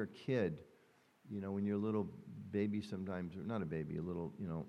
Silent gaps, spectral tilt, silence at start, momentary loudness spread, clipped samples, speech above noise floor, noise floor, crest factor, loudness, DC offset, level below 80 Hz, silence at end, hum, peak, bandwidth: none; -8.5 dB/octave; 0 s; 9 LU; under 0.1%; 30 dB; -70 dBFS; 18 dB; -41 LUFS; under 0.1%; -74 dBFS; 0 s; none; -24 dBFS; 10 kHz